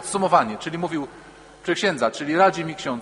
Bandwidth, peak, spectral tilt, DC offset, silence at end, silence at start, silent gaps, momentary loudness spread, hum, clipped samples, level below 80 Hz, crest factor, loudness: 10.5 kHz; -4 dBFS; -4.5 dB/octave; under 0.1%; 0 s; 0 s; none; 11 LU; none; under 0.1%; -60 dBFS; 20 dB; -22 LUFS